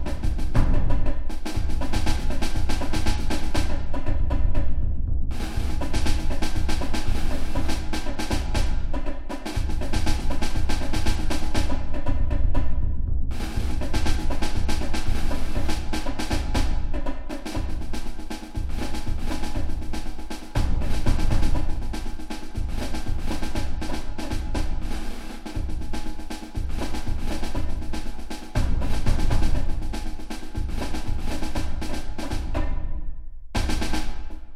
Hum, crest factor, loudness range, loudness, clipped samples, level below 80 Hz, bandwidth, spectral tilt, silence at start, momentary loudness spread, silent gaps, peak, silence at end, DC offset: none; 16 dB; 4 LU; -30 LUFS; under 0.1%; -24 dBFS; 11.5 kHz; -5.5 dB/octave; 0 s; 8 LU; none; -4 dBFS; 0 s; under 0.1%